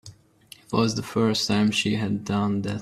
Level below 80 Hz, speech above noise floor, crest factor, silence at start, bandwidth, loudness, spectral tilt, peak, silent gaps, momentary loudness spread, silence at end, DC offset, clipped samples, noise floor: -58 dBFS; 28 dB; 18 dB; 0.05 s; 14 kHz; -24 LUFS; -5 dB/octave; -6 dBFS; none; 5 LU; 0 s; under 0.1%; under 0.1%; -52 dBFS